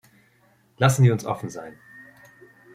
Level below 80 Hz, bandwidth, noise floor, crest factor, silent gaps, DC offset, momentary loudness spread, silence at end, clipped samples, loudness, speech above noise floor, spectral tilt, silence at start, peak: -62 dBFS; 14.5 kHz; -61 dBFS; 22 dB; none; under 0.1%; 21 LU; 1.05 s; under 0.1%; -21 LUFS; 40 dB; -6 dB/octave; 0.8 s; -4 dBFS